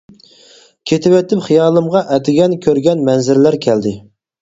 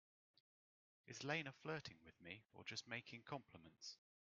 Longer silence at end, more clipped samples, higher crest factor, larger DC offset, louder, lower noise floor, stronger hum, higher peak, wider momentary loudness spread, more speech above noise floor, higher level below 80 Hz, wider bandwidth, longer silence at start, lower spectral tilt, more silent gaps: about the same, 0.4 s vs 0.45 s; neither; second, 14 dB vs 26 dB; neither; first, -13 LUFS vs -52 LUFS; second, -45 dBFS vs under -90 dBFS; neither; first, 0 dBFS vs -28 dBFS; second, 6 LU vs 13 LU; second, 33 dB vs over 37 dB; first, -54 dBFS vs -88 dBFS; about the same, 7.8 kHz vs 7.2 kHz; second, 0.85 s vs 1.05 s; first, -6.5 dB/octave vs -3 dB/octave; neither